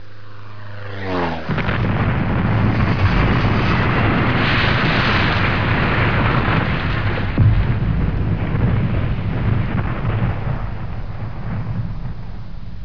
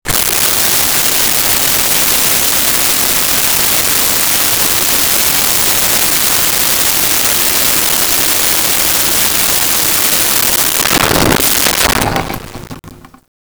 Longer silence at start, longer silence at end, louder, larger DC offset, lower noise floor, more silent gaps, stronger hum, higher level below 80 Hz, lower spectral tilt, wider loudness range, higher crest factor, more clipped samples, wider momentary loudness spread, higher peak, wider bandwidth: about the same, 0 s vs 0.05 s; second, 0 s vs 0.45 s; second, -19 LUFS vs -8 LUFS; first, 4% vs under 0.1%; first, -39 dBFS vs -35 dBFS; neither; neither; first, -26 dBFS vs -34 dBFS; first, -8 dB/octave vs -1 dB/octave; first, 6 LU vs 1 LU; about the same, 16 dB vs 12 dB; neither; first, 13 LU vs 1 LU; about the same, -2 dBFS vs 0 dBFS; second, 5.4 kHz vs over 20 kHz